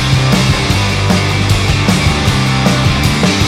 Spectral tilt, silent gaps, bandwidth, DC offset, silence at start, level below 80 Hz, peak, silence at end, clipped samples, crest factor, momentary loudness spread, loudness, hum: -5 dB/octave; none; 16 kHz; under 0.1%; 0 s; -22 dBFS; 0 dBFS; 0 s; under 0.1%; 10 dB; 1 LU; -12 LUFS; none